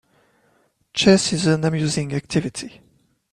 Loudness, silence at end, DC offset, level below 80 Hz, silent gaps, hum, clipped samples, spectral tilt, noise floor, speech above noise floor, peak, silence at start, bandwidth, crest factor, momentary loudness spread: -20 LUFS; 0.65 s; under 0.1%; -52 dBFS; none; none; under 0.1%; -5 dB/octave; -63 dBFS; 43 dB; -2 dBFS; 0.95 s; 11.5 kHz; 20 dB; 15 LU